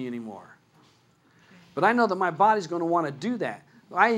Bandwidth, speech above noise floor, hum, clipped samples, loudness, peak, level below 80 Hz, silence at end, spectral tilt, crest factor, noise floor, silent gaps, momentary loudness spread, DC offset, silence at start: 12 kHz; 37 dB; none; under 0.1%; -25 LUFS; -6 dBFS; -78 dBFS; 0 s; -6 dB/octave; 22 dB; -61 dBFS; none; 17 LU; under 0.1%; 0 s